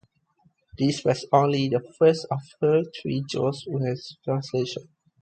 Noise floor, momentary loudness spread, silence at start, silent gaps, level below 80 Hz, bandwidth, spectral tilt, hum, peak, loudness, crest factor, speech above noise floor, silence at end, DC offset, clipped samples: -65 dBFS; 9 LU; 0.75 s; none; -62 dBFS; 9 kHz; -6.5 dB/octave; none; -6 dBFS; -25 LUFS; 20 dB; 41 dB; 0.4 s; under 0.1%; under 0.1%